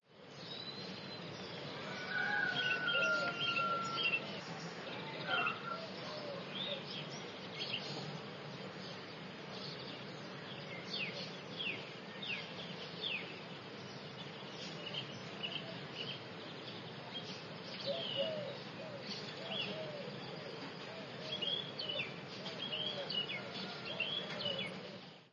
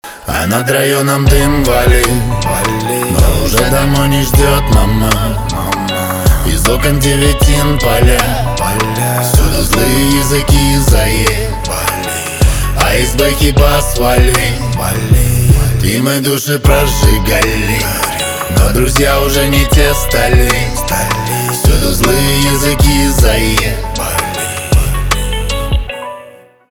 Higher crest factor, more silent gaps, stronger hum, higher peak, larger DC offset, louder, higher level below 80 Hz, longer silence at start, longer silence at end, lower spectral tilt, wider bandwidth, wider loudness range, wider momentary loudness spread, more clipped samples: first, 20 dB vs 10 dB; neither; neither; second, -24 dBFS vs 0 dBFS; neither; second, -41 LUFS vs -11 LUFS; second, -82 dBFS vs -14 dBFS; about the same, 0.1 s vs 0.05 s; second, 0.05 s vs 0.4 s; about the same, -4 dB/octave vs -4.5 dB/octave; second, 10 kHz vs over 20 kHz; first, 9 LU vs 1 LU; first, 12 LU vs 6 LU; neither